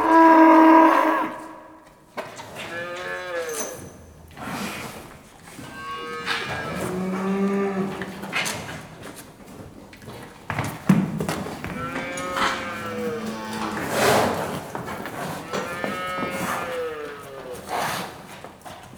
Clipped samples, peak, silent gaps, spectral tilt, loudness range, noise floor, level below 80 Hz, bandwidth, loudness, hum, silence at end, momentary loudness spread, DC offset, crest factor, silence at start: under 0.1%; -2 dBFS; none; -5 dB/octave; 7 LU; -48 dBFS; -54 dBFS; over 20 kHz; -23 LUFS; none; 0 s; 21 LU; under 0.1%; 22 dB; 0 s